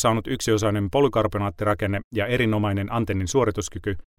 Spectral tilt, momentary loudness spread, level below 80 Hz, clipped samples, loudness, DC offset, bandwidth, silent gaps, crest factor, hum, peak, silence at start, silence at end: -5.5 dB/octave; 5 LU; -44 dBFS; under 0.1%; -24 LUFS; under 0.1%; 16 kHz; 2.04-2.11 s; 16 dB; none; -6 dBFS; 0 s; 0.2 s